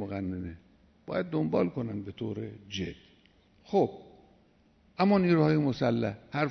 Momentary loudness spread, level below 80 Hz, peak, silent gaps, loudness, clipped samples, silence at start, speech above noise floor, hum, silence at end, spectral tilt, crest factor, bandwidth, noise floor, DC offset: 15 LU; -62 dBFS; -12 dBFS; none; -30 LUFS; under 0.1%; 0 s; 35 dB; none; 0 s; -8 dB/octave; 18 dB; 6.4 kHz; -64 dBFS; under 0.1%